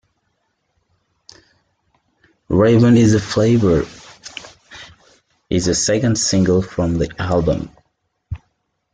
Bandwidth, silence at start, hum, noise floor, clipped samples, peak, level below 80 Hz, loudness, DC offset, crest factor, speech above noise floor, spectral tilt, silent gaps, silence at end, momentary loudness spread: 9.6 kHz; 2.5 s; none; -69 dBFS; under 0.1%; -2 dBFS; -40 dBFS; -16 LUFS; under 0.1%; 16 dB; 54 dB; -5.5 dB/octave; none; 0.55 s; 22 LU